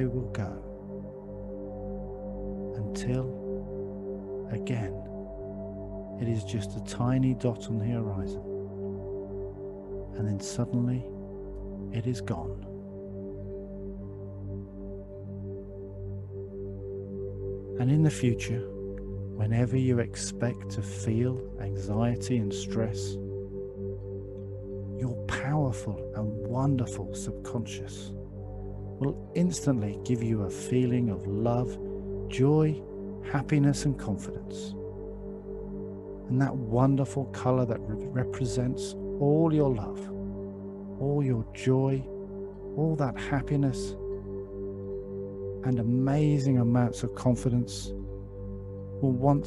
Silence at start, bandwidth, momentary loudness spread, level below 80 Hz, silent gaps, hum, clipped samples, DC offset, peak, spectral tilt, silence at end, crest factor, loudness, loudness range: 0 s; 12 kHz; 14 LU; -48 dBFS; none; 50 Hz at -50 dBFS; under 0.1%; under 0.1%; -10 dBFS; -7.5 dB/octave; 0 s; 20 dB; -31 LUFS; 8 LU